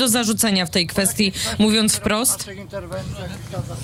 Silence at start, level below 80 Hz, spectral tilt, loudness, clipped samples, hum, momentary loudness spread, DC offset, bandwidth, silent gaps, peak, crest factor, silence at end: 0 s; -44 dBFS; -3 dB/octave; -18 LUFS; under 0.1%; none; 13 LU; under 0.1%; 16 kHz; none; -8 dBFS; 14 dB; 0 s